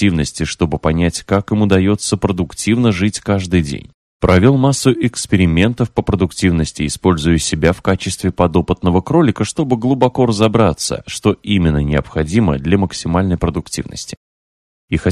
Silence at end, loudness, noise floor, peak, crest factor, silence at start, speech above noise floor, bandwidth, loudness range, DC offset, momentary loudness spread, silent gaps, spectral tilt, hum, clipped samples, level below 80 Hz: 0 s; -15 LUFS; under -90 dBFS; 0 dBFS; 14 dB; 0 s; over 75 dB; 13.5 kHz; 2 LU; under 0.1%; 7 LU; 3.94-4.20 s, 14.17-14.88 s; -6 dB/octave; none; under 0.1%; -32 dBFS